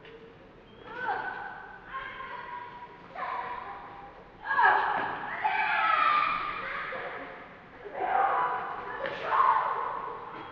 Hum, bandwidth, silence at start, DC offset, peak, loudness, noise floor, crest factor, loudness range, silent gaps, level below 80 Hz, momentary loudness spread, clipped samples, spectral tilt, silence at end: none; 6.8 kHz; 0 s; under 0.1%; -10 dBFS; -29 LUFS; -52 dBFS; 20 dB; 11 LU; none; -62 dBFS; 21 LU; under 0.1%; 0 dB/octave; 0 s